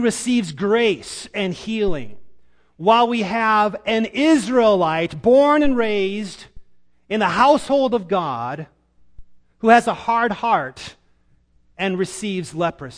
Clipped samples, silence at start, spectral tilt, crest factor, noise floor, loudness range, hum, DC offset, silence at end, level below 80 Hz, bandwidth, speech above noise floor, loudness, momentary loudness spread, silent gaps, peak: under 0.1%; 0 s; -5 dB/octave; 20 dB; -57 dBFS; 4 LU; none; under 0.1%; 0 s; -46 dBFS; 10.5 kHz; 39 dB; -19 LUFS; 13 LU; none; 0 dBFS